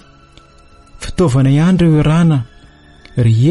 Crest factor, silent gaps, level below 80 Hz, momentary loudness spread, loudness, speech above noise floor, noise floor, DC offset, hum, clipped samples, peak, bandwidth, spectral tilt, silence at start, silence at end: 10 dB; none; -34 dBFS; 14 LU; -12 LUFS; 33 dB; -43 dBFS; under 0.1%; none; under 0.1%; -2 dBFS; 11.5 kHz; -8 dB/octave; 0.95 s; 0 s